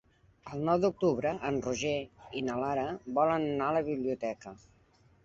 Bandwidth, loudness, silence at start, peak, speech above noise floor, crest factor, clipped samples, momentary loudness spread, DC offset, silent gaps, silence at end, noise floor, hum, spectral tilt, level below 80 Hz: 8 kHz; -32 LUFS; 0.45 s; -14 dBFS; 33 dB; 18 dB; under 0.1%; 10 LU; under 0.1%; none; 0.7 s; -64 dBFS; none; -6 dB/octave; -62 dBFS